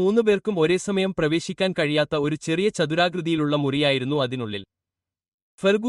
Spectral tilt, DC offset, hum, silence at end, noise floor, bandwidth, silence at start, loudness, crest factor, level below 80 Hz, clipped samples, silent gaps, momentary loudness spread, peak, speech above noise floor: -5.5 dB/octave; under 0.1%; none; 0 s; -89 dBFS; 11.5 kHz; 0 s; -23 LUFS; 16 dB; -58 dBFS; under 0.1%; 5.28-5.58 s; 4 LU; -6 dBFS; 67 dB